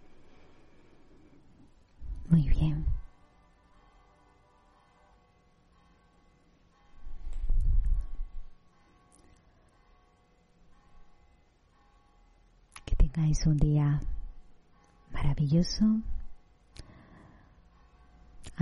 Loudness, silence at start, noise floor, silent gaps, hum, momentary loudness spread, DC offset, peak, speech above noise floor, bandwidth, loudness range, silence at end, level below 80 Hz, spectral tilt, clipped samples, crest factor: -30 LUFS; 0.1 s; -65 dBFS; none; none; 26 LU; under 0.1%; -12 dBFS; 39 dB; 11 kHz; 11 LU; 0 s; -36 dBFS; -7 dB/octave; under 0.1%; 20 dB